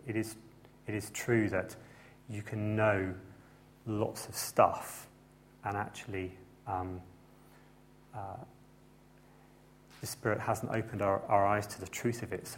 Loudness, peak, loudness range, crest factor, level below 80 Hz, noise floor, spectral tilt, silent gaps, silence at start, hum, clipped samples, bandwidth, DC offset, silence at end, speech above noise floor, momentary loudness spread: -34 LUFS; -10 dBFS; 12 LU; 26 dB; -64 dBFS; -60 dBFS; -5.5 dB/octave; none; 0.05 s; none; under 0.1%; 16.5 kHz; under 0.1%; 0 s; 26 dB; 20 LU